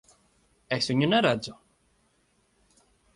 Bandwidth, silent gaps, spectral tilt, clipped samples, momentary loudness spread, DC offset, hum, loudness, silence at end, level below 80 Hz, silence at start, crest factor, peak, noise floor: 11.5 kHz; none; -5 dB/octave; under 0.1%; 10 LU; under 0.1%; none; -25 LUFS; 1.65 s; -64 dBFS; 0.7 s; 22 dB; -10 dBFS; -69 dBFS